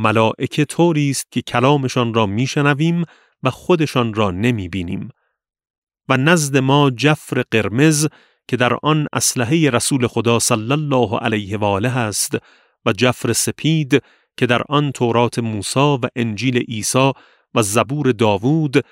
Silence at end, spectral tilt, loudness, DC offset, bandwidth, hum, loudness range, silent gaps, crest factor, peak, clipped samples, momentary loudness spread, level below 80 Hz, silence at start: 0.1 s; -5 dB/octave; -17 LUFS; under 0.1%; 16 kHz; none; 2 LU; 5.70-5.87 s; 18 dB; 0 dBFS; under 0.1%; 7 LU; -54 dBFS; 0 s